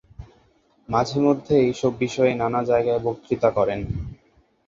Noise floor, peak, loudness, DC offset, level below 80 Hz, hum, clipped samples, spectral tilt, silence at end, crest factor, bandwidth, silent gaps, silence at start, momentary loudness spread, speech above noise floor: -60 dBFS; -4 dBFS; -22 LUFS; under 0.1%; -46 dBFS; none; under 0.1%; -7 dB/octave; 0.55 s; 18 dB; 7.8 kHz; none; 0.2 s; 8 LU; 39 dB